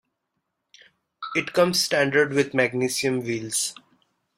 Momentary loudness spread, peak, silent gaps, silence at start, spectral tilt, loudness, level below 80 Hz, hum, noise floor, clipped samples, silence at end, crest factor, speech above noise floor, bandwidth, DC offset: 7 LU; -6 dBFS; none; 1.2 s; -3.5 dB/octave; -23 LUFS; -66 dBFS; none; -79 dBFS; under 0.1%; 0.65 s; 20 dB; 56 dB; 16 kHz; under 0.1%